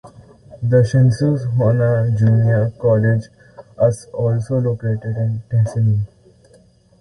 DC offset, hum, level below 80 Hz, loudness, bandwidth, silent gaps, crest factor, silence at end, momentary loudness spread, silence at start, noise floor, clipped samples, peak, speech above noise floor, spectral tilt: under 0.1%; none; -46 dBFS; -17 LUFS; 11 kHz; none; 14 dB; 0.95 s; 8 LU; 0.05 s; -51 dBFS; under 0.1%; -2 dBFS; 35 dB; -9 dB/octave